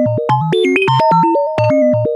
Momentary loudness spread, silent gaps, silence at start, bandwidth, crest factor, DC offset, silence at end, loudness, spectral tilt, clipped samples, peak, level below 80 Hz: 3 LU; none; 0 s; 11 kHz; 12 dB; under 0.1%; 0 s; -13 LUFS; -7.5 dB/octave; under 0.1%; 0 dBFS; -52 dBFS